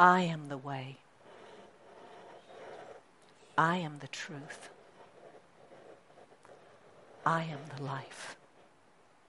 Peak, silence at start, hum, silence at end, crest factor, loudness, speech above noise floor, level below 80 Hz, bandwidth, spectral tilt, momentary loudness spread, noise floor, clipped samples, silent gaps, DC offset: -8 dBFS; 0 s; none; 0.95 s; 28 dB; -35 LUFS; 33 dB; -80 dBFS; 11.5 kHz; -5.5 dB/octave; 27 LU; -65 dBFS; under 0.1%; none; under 0.1%